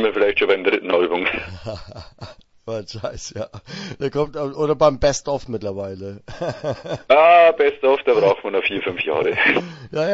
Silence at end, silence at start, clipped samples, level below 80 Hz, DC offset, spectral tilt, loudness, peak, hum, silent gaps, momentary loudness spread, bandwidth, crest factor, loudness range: 0 s; 0 s; under 0.1%; -46 dBFS; under 0.1%; -4.5 dB/octave; -18 LUFS; 0 dBFS; none; none; 18 LU; 8 kHz; 18 dB; 11 LU